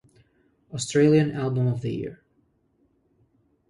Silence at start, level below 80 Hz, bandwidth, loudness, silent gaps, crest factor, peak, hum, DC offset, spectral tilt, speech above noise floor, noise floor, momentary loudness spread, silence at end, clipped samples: 0.7 s; -60 dBFS; 11.5 kHz; -23 LUFS; none; 18 dB; -8 dBFS; none; under 0.1%; -6.5 dB/octave; 44 dB; -67 dBFS; 16 LU; 1.55 s; under 0.1%